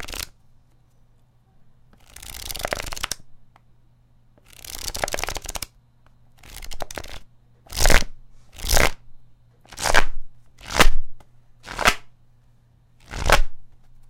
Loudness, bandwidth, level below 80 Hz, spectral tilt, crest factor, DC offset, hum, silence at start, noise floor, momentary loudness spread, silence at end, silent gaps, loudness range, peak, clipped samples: -24 LUFS; 17 kHz; -28 dBFS; -2 dB/octave; 22 dB; under 0.1%; none; 0 s; -56 dBFS; 22 LU; 0.45 s; none; 10 LU; 0 dBFS; under 0.1%